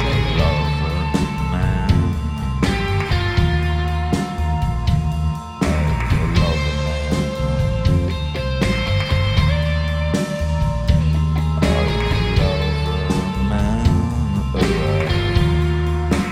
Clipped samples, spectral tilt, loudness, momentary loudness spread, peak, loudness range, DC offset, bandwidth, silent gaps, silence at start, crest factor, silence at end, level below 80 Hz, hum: under 0.1%; -6.5 dB/octave; -19 LUFS; 4 LU; -4 dBFS; 1 LU; under 0.1%; 13 kHz; none; 0 s; 14 dB; 0 s; -24 dBFS; none